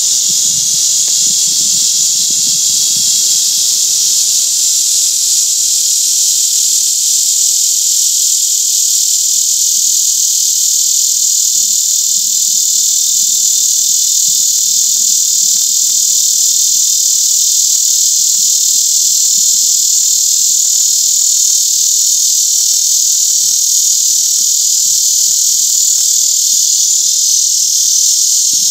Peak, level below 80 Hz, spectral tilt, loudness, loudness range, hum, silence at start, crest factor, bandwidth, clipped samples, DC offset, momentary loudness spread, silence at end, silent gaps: 0 dBFS; -68 dBFS; 4 dB/octave; -8 LUFS; 1 LU; none; 0 s; 10 dB; over 20 kHz; under 0.1%; under 0.1%; 1 LU; 0 s; none